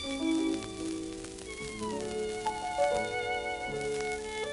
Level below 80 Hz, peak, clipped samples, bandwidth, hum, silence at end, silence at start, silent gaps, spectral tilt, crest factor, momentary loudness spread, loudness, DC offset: -54 dBFS; -16 dBFS; under 0.1%; 11.5 kHz; none; 0 s; 0 s; none; -3.5 dB/octave; 18 dB; 10 LU; -34 LUFS; under 0.1%